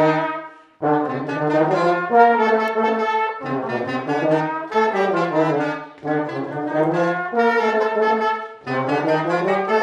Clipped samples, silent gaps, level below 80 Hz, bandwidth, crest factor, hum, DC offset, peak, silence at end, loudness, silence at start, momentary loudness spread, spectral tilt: under 0.1%; none; -74 dBFS; 9.4 kHz; 18 dB; none; under 0.1%; -2 dBFS; 0 s; -20 LUFS; 0 s; 8 LU; -7 dB/octave